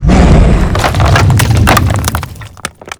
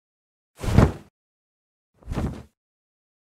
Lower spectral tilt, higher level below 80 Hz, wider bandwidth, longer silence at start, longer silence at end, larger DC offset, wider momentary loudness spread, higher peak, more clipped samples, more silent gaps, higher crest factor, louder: second, -5.5 dB/octave vs -7.5 dB/octave; first, -14 dBFS vs -34 dBFS; first, over 20 kHz vs 14.5 kHz; second, 0 s vs 0.6 s; second, 0.1 s vs 0.85 s; neither; second, 17 LU vs 21 LU; about the same, 0 dBFS vs -2 dBFS; first, 3% vs under 0.1%; second, none vs 1.10-1.93 s; second, 8 dB vs 26 dB; first, -9 LUFS vs -24 LUFS